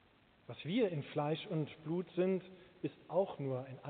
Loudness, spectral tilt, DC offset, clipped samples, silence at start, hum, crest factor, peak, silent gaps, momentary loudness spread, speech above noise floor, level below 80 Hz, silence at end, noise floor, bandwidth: -39 LUFS; -6 dB/octave; under 0.1%; under 0.1%; 0.5 s; none; 16 dB; -22 dBFS; none; 10 LU; 22 dB; -78 dBFS; 0 s; -60 dBFS; 4.6 kHz